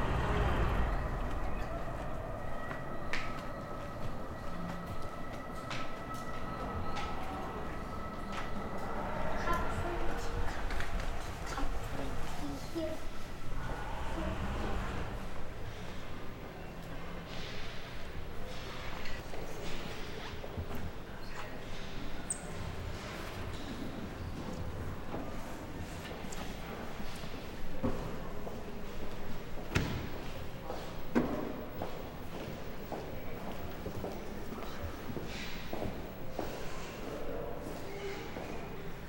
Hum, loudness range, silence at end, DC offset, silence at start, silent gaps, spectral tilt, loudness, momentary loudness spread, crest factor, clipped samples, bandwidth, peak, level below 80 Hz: none; 5 LU; 0 s; under 0.1%; 0 s; none; -5.5 dB/octave; -41 LUFS; 8 LU; 20 dB; under 0.1%; 16.5 kHz; -16 dBFS; -42 dBFS